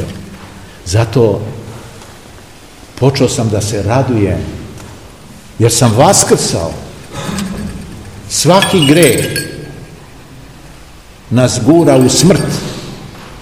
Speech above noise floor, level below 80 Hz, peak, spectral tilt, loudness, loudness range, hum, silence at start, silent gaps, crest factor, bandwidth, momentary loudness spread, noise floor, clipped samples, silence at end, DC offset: 26 dB; -36 dBFS; 0 dBFS; -4.5 dB/octave; -11 LUFS; 4 LU; none; 0 s; none; 14 dB; over 20 kHz; 24 LU; -36 dBFS; 0.8%; 0 s; 0.5%